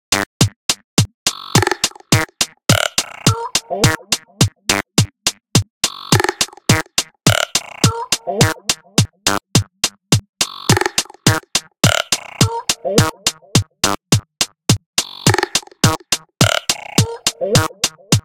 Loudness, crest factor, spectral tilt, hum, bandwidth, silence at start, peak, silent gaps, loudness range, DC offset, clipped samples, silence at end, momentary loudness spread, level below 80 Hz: -17 LUFS; 18 dB; -3.5 dB/octave; none; 17.5 kHz; 0.1 s; 0 dBFS; 0.26-0.40 s, 0.56-0.69 s, 0.84-0.97 s, 1.14-1.26 s, 5.70-5.81 s, 10.29-10.33 s, 14.86-14.93 s; 1 LU; under 0.1%; under 0.1%; 0.05 s; 5 LU; -44 dBFS